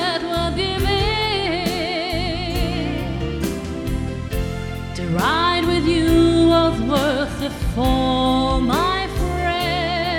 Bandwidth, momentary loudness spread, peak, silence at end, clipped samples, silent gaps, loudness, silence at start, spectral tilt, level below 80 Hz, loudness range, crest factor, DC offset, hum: 17.5 kHz; 10 LU; -4 dBFS; 0 s; under 0.1%; none; -20 LUFS; 0 s; -5.5 dB/octave; -30 dBFS; 6 LU; 16 dB; under 0.1%; none